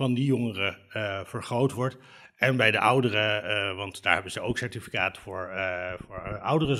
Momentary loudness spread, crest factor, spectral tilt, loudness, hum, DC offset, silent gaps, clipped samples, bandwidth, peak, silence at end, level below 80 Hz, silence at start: 12 LU; 24 dB; -5.5 dB/octave; -27 LUFS; none; under 0.1%; none; under 0.1%; 15.5 kHz; -4 dBFS; 0 s; -56 dBFS; 0 s